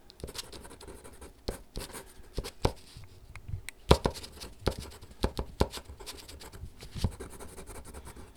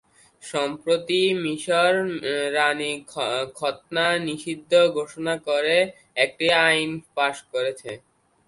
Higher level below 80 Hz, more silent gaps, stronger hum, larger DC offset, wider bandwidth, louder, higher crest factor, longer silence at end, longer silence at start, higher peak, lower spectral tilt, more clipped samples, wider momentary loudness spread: first, -42 dBFS vs -68 dBFS; neither; neither; neither; first, over 20 kHz vs 11.5 kHz; second, -36 LUFS vs -23 LUFS; first, 34 dB vs 20 dB; second, 0 s vs 0.5 s; second, 0 s vs 0.45 s; about the same, -2 dBFS vs -4 dBFS; first, -5 dB/octave vs -3.5 dB/octave; neither; first, 15 LU vs 10 LU